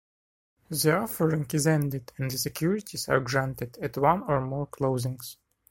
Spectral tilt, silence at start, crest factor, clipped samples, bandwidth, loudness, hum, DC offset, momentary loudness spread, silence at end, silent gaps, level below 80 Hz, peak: -5 dB/octave; 0.7 s; 20 dB; under 0.1%; 16.5 kHz; -28 LUFS; none; under 0.1%; 9 LU; 0.4 s; none; -56 dBFS; -8 dBFS